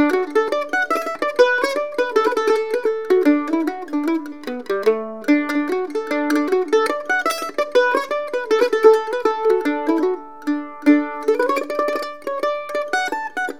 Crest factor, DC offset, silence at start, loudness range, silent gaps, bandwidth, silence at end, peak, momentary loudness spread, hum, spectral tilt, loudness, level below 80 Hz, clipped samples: 18 dB; 0.7%; 0 s; 3 LU; none; 16.5 kHz; 0 s; 0 dBFS; 8 LU; none; -3 dB/octave; -19 LUFS; -74 dBFS; under 0.1%